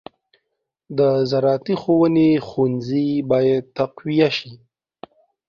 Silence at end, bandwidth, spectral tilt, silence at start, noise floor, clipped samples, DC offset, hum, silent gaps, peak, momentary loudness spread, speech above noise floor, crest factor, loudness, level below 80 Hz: 0.9 s; 7 kHz; -8 dB/octave; 0.9 s; -77 dBFS; under 0.1%; under 0.1%; none; none; -4 dBFS; 7 LU; 59 dB; 16 dB; -19 LUFS; -60 dBFS